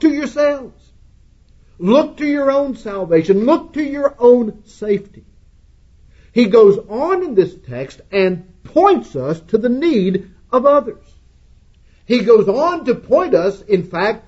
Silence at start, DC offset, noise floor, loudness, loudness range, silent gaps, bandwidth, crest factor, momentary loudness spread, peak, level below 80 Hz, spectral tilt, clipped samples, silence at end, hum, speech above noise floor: 0 s; under 0.1%; -48 dBFS; -15 LUFS; 2 LU; none; 8 kHz; 16 dB; 11 LU; 0 dBFS; -48 dBFS; -7 dB/octave; under 0.1%; 0.1 s; none; 33 dB